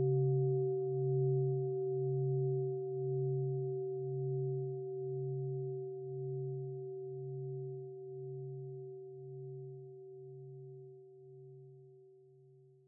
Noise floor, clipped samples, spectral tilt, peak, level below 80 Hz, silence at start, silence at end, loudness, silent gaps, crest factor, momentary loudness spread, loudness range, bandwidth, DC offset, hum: -63 dBFS; under 0.1%; -9 dB/octave; -24 dBFS; -86 dBFS; 0 s; 0.25 s; -38 LUFS; none; 14 dB; 19 LU; 16 LU; 0.8 kHz; under 0.1%; none